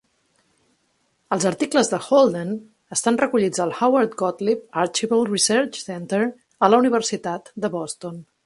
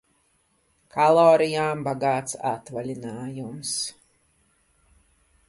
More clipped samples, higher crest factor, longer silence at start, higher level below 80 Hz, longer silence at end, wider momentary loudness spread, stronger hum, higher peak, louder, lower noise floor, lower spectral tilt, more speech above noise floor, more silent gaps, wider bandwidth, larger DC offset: neither; about the same, 22 dB vs 20 dB; first, 1.3 s vs 0.95 s; about the same, -68 dBFS vs -66 dBFS; second, 0.25 s vs 1.55 s; second, 12 LU vs 17 LU; neither; first, 0 dBFS vs -4 dBFS; first, -21 LUFS vs -24 LUFS; about the same, -67 dBFS vs -67 dBFS; about the same, -4 dB/octave vs -4.5 dB/octave; about the same, 47 dB vs 44 dB; neither; about the same, 11.5 kHz vs 11.5 kHz; neither